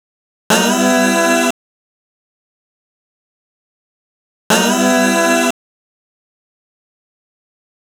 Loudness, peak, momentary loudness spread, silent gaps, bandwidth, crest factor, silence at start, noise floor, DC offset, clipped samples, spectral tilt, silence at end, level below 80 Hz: -13 LUFS; 0 dBFS; 7 LU; 1.51-4.50 s; over 20 kHz; 18 dB; 0.5 s; under -90 dBFS; under 0.1%; under 0.1%; -3 dB/octave; 2.5 s; -64 dBFS